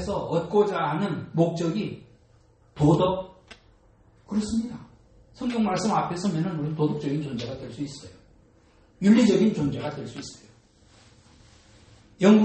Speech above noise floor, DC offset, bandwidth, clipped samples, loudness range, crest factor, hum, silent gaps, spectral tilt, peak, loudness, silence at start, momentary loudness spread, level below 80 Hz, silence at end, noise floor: 35 dB; under 0.1%; 8.8 kHz; under 0.1%; 3 LU; 20 dB; none; none; -7 dB/octave; -6 dBFS; -25 LUFS; 0 s; 16 LU; -54 dBFS; 0 s; -58 dBFS